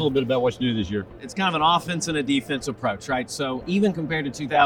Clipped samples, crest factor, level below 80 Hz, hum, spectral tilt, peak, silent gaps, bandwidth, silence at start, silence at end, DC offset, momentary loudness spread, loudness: under 0.1%; 20 dB; -52 dBFS; none; -5 dB/octave; -2 dBFS; none; 17.5 kHz; 0 s; 0 s; under 0.1%; 8 LU; -24 LUFS